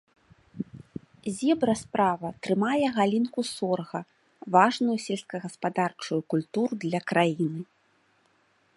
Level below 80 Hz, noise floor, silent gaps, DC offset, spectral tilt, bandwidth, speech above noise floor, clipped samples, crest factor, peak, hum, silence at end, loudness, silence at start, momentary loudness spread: -68 dBFS; -67 dBFS; none; under 0.1%; -5.5 dB/octave; 11.5 kHz; 40 dB; under 0.1%; 22 dB; -6 dBFS; none; 1.15 s; -27 LUFS; 0.55 s; 15 LU